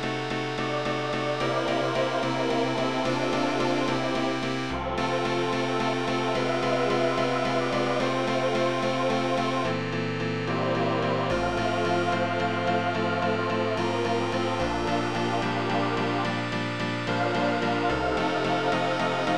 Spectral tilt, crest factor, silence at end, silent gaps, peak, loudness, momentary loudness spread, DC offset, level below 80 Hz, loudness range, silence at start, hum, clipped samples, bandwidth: -5.5 dB/octave; 14 dB; 0 s; none; -14 dBFS; -26 LUFS; 3 LU; 0.6%; -50 dBFS; 1 LU; 0 s; none; under 0.1%; 12.5 kHz